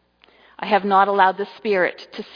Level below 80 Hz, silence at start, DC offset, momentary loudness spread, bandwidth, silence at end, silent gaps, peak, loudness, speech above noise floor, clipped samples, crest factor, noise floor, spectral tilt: -70 dBFS; 0.6 s; under 0.1%; 13 LU; 5.2 kHz; 0.1 s; none; -2 dBFS; -19 LUFS; 35 dB; under 0.1%; 18 dB; -54 dBFS; -6.5 dB/octave